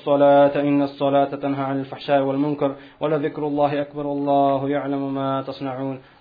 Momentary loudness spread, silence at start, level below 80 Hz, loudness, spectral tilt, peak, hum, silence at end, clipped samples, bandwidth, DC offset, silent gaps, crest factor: 12 LU; 0 s; -60 dBFS; -21 LUFS; -10 dB/octave; -6 dBFS; none; 0.2 s; under 0.1%; 5 kHz; under 0.1%; none; 14 dB